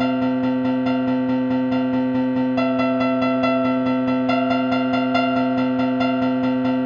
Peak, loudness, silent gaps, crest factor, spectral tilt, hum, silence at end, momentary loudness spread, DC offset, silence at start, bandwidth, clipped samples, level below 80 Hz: -6 dBFS; -20 LUFS; none; 14 dB; -8 dB/octave; none; 0 s; 2 LU; under 0.1%; 0 s; 5.2 kHz; under 0.1%; -56 dBFS